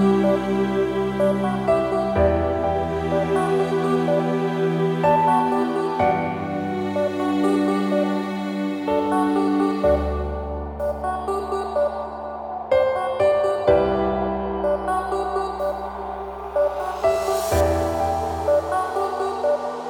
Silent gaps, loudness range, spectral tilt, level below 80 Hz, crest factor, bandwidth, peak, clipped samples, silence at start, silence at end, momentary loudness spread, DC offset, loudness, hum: none; 3 LU; -7 dB/octave; -38 dBFS; 16 dB; 18 kHz; -6 dBFS; under 0.1%; 0 s; 0 s; 7 LU; under 0.1%; -22 LUFS; none